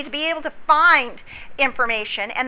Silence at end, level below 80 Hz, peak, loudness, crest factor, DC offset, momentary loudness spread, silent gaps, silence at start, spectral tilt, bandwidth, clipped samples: 0 s; -52 dBFS; -2 dBFS; -18 LUFS; 18 dB; under 0.1%; 17 LU; none; 0 s; -5.5 dB/octave; 4 kHz; under 0.1%